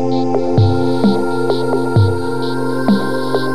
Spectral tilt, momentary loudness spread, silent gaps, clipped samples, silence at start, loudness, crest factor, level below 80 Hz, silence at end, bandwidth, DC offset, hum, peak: -7.5 dB/octave; 5 LU; none; under 0.1%; 0 s; -16 LUFS; 14 dB; -42 dBFS; 0 s; 13.5 kHz; 9%; none; -2 dBFS